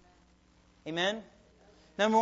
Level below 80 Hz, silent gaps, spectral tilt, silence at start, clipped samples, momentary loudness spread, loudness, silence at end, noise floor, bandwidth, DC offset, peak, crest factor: -68 dBFS; none; -4 dB/octave; 0.85 s; under 0.1%; 18 LU; -32 LUFS; 0 s; -64 dBFS; 8 kHz; under 0.1%; -14 dBFS; 20 dB